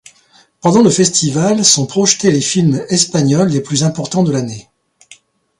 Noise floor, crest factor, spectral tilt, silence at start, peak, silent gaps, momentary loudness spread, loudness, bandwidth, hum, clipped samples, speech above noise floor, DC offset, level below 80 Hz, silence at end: -50 dBFS; 14 dB; -4.5 dB/octave; 0.65 s; 0 dBFS; none; 6 LU; -12 LUFS; 11.5 kHz; none; under 0.1%; 38 dB; under 0.1%; -52 dBFS; 1 s